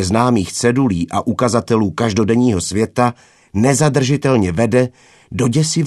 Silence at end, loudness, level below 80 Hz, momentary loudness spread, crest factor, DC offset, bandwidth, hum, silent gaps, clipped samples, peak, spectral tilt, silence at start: 0 s; -16 LUFS; -44 dBFS; 5 LU; 16 dB; under 0.1%; 13 kHz; none; none; under 0.1%; 0 dBFS; -5.5 dB/octave; 0 s